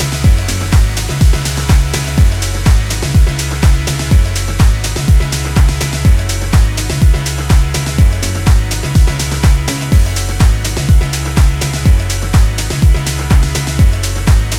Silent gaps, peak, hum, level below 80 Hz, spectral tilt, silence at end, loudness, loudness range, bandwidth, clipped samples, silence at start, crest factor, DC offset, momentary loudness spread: none; 0 dBFS; none; -12 dBFS; -5 dB/octave; 0 s; -13 LUFS; 0 LU; 16 kHz; under 0.1%; 0 s; 10 dB; under 0.1%; 3 LU